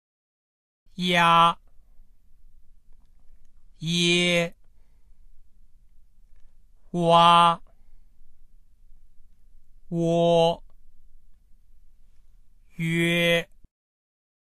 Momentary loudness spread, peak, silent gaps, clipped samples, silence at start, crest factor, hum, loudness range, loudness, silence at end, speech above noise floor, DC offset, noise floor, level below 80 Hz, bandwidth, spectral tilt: 17 LU; -4 dBFS; none; under 0.1%; 1 s; 22 dB; none; 4 LU; -21 LUFS; 1.05 s; 30 dB; 0.1%; -50 dBFS; -52 dBFS; 13 kHz; -4.5 dB/octave